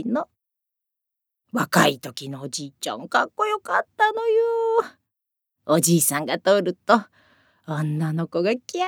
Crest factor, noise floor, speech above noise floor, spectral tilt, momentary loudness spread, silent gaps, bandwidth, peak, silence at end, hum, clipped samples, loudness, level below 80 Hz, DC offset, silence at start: 22 dB; -84 dBFS; 62 dB; -4 dB/octave; 13 LU; none; over 20 kHz; -2 dBFS; 0 s; none; under 0.1%; -22 LUFS; -76 dBFS; under 0.1%; 0 s